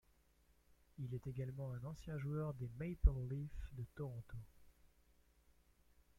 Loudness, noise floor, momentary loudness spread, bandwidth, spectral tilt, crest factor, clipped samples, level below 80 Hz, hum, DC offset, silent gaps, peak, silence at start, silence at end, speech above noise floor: -45 LUFS; -74 dBFS; 15 LU; 14 kHz; -9 dB/octave; 24 dB; under 0.1%; -48 dBFS; 60 Hz at -65 dBFS; under 0.1%; none; -20 dBFS; 1 s; 1.3 s; 31 dB